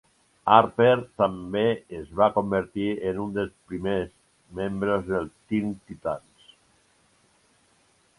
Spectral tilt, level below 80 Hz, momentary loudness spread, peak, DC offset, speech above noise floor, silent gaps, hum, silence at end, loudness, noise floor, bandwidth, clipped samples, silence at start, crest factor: -7.5 dB/octave; -54 dBFS; 14 LU; -2 dBFS; under 0.1%; 39 dB; none; none; 2 s; -25 LUFS; -64 dBFS; 11.5 kHz; under 0.1%; 0.45 s; 24 dB